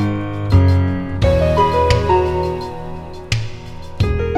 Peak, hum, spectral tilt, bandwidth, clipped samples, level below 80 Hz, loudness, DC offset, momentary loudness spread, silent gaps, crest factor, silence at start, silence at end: 0 dBFS; none; -7 dB/octave; 10 kHz; under 0.1%; -26 dBFS; -17 LUFS; under 0.1%; 16 LU; none; 16 dB; 0 s; 0 s